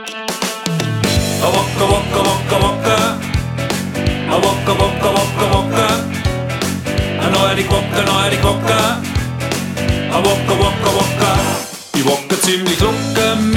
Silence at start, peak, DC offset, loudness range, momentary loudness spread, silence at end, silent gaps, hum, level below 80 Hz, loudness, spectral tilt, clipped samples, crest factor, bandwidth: 0 s; 0 dBFS; under 0.1%; 1 LU; 6 LU; 0 s; none; none; -30 dBFS; -15 LUFS; -4.5 dB/octave; under 0.1%; 14 dB; 18 kHz